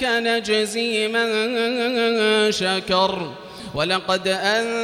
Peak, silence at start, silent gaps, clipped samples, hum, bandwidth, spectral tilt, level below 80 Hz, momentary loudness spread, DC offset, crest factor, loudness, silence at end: -6 dBFS; 0 s; none; under 0.1%; none; 15.5 kHz; -3.5 dB/octave; -56 dBFS; 6 LU; under 0.1%; 16 dB; -20 LUFS; 0 s